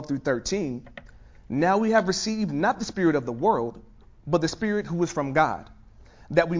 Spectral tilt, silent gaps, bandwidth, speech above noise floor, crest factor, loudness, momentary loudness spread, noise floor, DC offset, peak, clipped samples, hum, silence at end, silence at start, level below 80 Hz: -5.5 dB/octave; none; 7.6 kHz; 25 dB; 20 dB; -25 LUFS; 10 LU; -50 dBFS; under 0.1%; -6 dBFS; under 0.1%; none; 0 s; 0 s; -52 dBFS